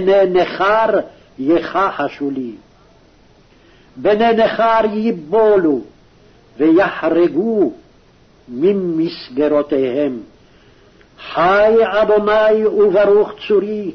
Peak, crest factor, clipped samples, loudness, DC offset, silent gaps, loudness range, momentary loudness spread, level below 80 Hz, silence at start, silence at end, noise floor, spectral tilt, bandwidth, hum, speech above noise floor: -4 dBFS; 12 dB; under 0.1%; -15 LUFS; under 0.1%; none; 5 LU; 10 LU; -50 dBFS; 0 s; 0 s; -49 dBFS; -7.5 dB/octave; 6.4 kHz; none; 35 dB